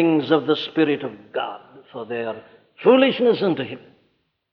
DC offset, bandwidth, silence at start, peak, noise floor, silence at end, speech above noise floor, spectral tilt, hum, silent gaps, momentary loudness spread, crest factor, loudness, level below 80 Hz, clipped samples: under 0.1%; 5.8 kHz; 0 s; -4 dBFS; -67 dBFS; 0.75 s; 47 dB; -8 dB/octave; none; none; 21 LU; 16 dB; -21 LUFS; -70 dBFS; under 0.1%